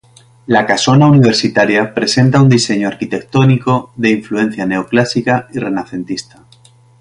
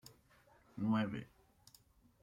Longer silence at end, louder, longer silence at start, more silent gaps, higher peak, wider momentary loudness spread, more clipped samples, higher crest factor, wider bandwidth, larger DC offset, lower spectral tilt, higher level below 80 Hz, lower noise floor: second, 0.8 s vs 1 s; first, -13 LUFS vs -39 LUFS; second, 0.5 s vs 0.75 s; neither; first, 0 dBFS vs -26 dBFS; second, 11 LU vs 24 LU; neither; second, 12 dB vs 18 dB; second, 11 kHz vs 15.5 kHz; neither; second, -5.5 dB/octave vs -7 dB/octave; first, -48 dBFS vs -72 dBFS; second, -45 dBFS vs -68 dBFS